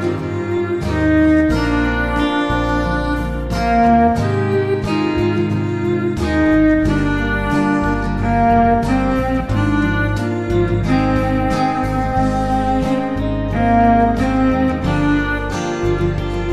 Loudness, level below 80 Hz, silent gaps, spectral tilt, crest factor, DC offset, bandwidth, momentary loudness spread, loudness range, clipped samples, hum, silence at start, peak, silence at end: -17 LUFS; -26 dBFS; none; -7.5 dB/octave; 14 dB; 0.3%; 13 kHz; 7 LU; 2 LU; under 0.1%; none; 0 s; -2 dBFS; 0 s